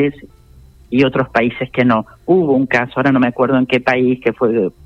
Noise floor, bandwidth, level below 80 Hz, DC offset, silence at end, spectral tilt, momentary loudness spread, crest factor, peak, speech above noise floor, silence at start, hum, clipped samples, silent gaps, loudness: -43 dBFS; 7 kHz; -48 dBFS; under 0.1%; 0.15 s; -8 dB/octave; 3 LU; 14 dB; 0 dBFS; 29 dB; 0 s; none; under 0.1%; none; -15 LUFS